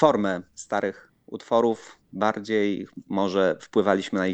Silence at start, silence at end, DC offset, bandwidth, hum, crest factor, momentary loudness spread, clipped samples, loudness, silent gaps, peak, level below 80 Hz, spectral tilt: 0 s; 0 s; under 0.1%; 9 kHz; none; 20 dB; 11 LU; under 0.1%; -25 LUFS; none; -4 dBFS; -68 dBFS; -5.5 dB/octave